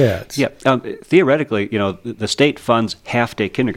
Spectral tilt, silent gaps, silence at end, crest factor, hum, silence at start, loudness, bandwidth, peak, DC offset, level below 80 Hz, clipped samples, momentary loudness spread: -5.5 dB/octave; none; 0 s; 18 dB; none; 0 s; -18 LUFS; 16 kHz; 0 dBFS; under 0.1%; -50 dBFS; under 0.1%; 7 LU